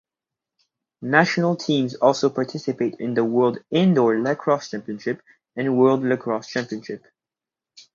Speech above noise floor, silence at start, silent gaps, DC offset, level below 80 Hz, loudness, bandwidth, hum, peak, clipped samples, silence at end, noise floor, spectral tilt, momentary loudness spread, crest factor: 68 dB; 1 s; none; under 0.1%; -70 dBFS; -21 LUFS; 7.6 kHz; none; 0 dBFS; under 0.1%; 0.95 s; -89 dBFS; -6 dB/octave; 13 LU; 22 dB